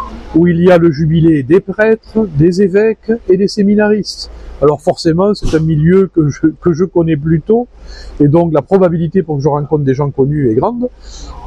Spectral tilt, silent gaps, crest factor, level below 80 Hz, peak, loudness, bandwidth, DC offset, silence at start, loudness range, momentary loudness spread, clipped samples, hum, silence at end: -8 dB/octave; none; 12 dB; -32 dBFS; 0 dBFS; -12 LUFS; 10 kHz; under 0.1%; 0 s; 2 LU; 7 LU; under 0.1%; none; 0 s